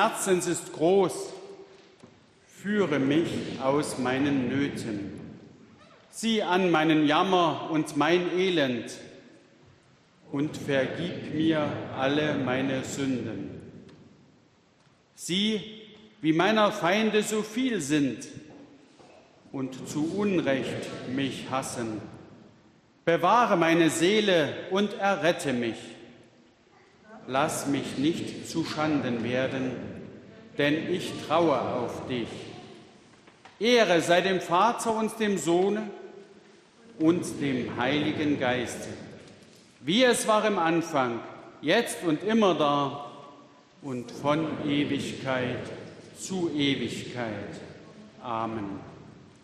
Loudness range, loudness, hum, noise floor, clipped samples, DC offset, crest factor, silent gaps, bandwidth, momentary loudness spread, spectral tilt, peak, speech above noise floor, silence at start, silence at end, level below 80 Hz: 6 LU; -27 LUFS; none; -62 dBFS; under 0.1%; under 0.1%; 20 dB; none; 14 kHz; 18 LU; -4.5 dB/octave; -8 dBFS; 36 dB; 0 s; 0.25 s; -68 dBFS